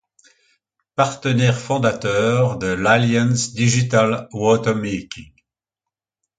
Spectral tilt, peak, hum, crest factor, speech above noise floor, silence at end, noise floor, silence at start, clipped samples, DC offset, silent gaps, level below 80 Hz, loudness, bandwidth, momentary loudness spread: -5.5 dB/octave; 0 dBFS; none; 18 dB; 68 dB; 1.15 s; -86 dBFS; 1 s; under 0.1%; under 0.1%; none; -50 dBFS; -18 LUFS; 9.4 kHz; 9 LU